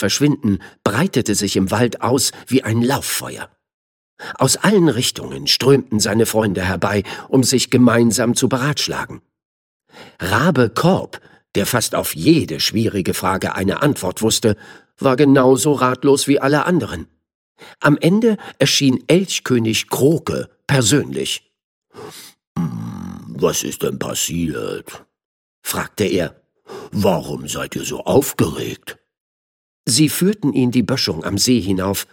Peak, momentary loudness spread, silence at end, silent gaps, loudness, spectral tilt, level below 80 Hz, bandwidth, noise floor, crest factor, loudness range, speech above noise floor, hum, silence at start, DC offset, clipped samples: 0 dBFS; 13 LU; 0.1 s; 3.74-4.17 s, 9.45-9.80 s, 17.35-17.55 s, 21.64-21.82 s, 22.47-22.55 s, 25.25-25.62 s, 29.20-29.84 s; -17 LUFS; -4.5 dB/octave; -50 dBFS; 17.5 kHz; under -90 dBFS; 18 dB; 7 LU; over 73 dB; none; 0 s; under 0.1%; under 0.1%